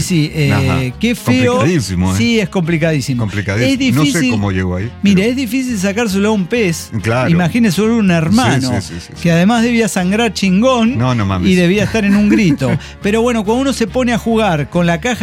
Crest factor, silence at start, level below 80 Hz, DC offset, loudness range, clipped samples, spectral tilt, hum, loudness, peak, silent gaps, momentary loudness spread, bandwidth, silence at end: 12 dB; 0 s; -36 dBFS; under 0.1%; 2 LU; under 0.1%; -5.5 dB/octave; none; -13 LUFS; 0 dBFS; none; 5 LU; 16.5 kHz; 0 s